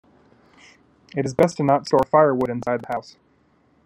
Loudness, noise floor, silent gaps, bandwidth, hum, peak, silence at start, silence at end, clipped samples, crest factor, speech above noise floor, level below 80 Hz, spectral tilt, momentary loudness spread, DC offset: -21 LUFS; -60 dBFS; none; 14.5 kHz; none; -2 dBFS; 1.15 s; 0.85 s; under 0.1%; 20 dB; 40 dB; -58 dBFS; -6.5 dB/octave; 13 LU; under 0.1%